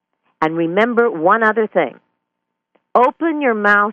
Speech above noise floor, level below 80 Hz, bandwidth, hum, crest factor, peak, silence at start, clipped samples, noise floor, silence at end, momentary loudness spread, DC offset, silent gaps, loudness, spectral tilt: 62 dB; -64 dBFS; 7.4 kHz; none; 16 dB; -2 dBFS; 0.4 s; under 0.1%; -77 dBFS; 0 s; 7 LU; under 0.1%; none; -16 LUFS; -7 dB/octave